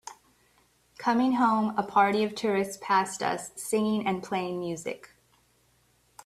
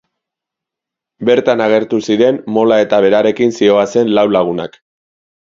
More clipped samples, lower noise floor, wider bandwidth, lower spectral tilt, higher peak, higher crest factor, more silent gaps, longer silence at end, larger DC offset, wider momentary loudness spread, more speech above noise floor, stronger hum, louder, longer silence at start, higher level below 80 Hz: neither; second, -66 dBFS vs -83 dBFS; first, 14.5 kHz vs 7.6 kHz; about the same, -4.5 dB/octave vs -5.5 dB/octave; second, -10 dBFS vs 0 dBFS; about the same, 18 dB vs 14 dB; neither; first, 1.2 s vs 0.85 s; neither; first, 11 LU vs 5 LU; second, 39 dB vs 72 dB; neither; second, -27 LUFS vs -12 LUFS; second, 0.05 s vs 1.2 s; second, -70 dBFS vs -56 dBFS